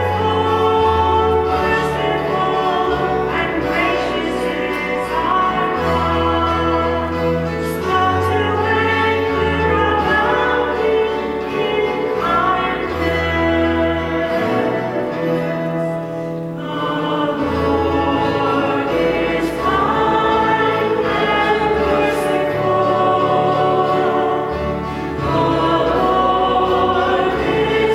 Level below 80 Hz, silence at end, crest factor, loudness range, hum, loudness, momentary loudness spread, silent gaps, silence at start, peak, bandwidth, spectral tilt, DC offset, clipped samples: -36 dBFS; 0 s; 14 dB; 3 LU; none; -17 LUFS; 5 LU; none; 0 s; -2 dBFS; 15.5 kHz; -6.5 dB/octave; under 0.1%; under 0.1%